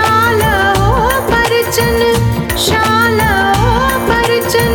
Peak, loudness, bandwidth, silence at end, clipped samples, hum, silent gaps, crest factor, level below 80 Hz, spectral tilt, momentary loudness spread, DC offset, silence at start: 0 dBFS; -11 LUFS; 19.5 kHz; 0 s; under 0.1%; none; none; 12 dB; -24 dBFS; -4.5 dB/octave; 2 LU; under 0.1%; 0 s